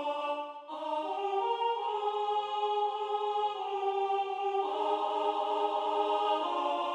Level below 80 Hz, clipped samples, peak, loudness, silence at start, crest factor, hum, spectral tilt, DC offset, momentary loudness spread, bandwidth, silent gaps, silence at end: under -90 dBFS; under 0.1%; -18 dBFS; -32 LUFS; 0 s; 14 dB; none; -2.5 dB/octave; under 0.1%; 4 LU; 9.6 kHz; none; 0 s